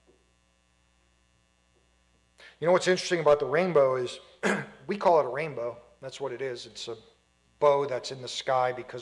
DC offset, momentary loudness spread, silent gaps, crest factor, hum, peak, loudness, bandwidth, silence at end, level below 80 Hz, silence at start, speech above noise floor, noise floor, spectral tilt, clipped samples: under 0.1%; 14 LU; none; 18 dB; 60 Hz at -55 dBFS; -12 dBFS; -27 LUFS; 11.5 kHz; 0 s; -68 dBFS; 2.4 s; 41 dB; -68 dBFS; -4.5 dB/octave; under 0.1%